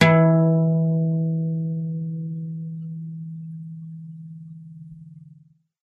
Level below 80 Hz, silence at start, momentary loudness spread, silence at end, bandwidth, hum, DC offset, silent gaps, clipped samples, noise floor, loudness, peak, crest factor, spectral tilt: -66 dBFS; 0 s; 24 LU; 0.55 s; 5.2 kHz; none; under 0.1%; none; under 0.1%; -54 dBFS; -22 LUFS; -2 dBFS; 22 dB; -8 dB/octave